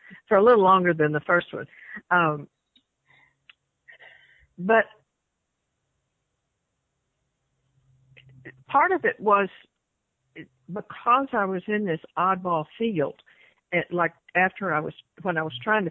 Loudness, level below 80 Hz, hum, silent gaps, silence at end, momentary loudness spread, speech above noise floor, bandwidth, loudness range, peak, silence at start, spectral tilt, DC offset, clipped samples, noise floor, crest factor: -23 LUFS; -68 dBFS; none; none; 0 s; 15 LU; 56 dB; 4.7 kHz; 6 LU; -6 dBFS; 0.1 s; -9 dB/octave; under 0.1%; under 0.1%; -79 dBFS; 20 dB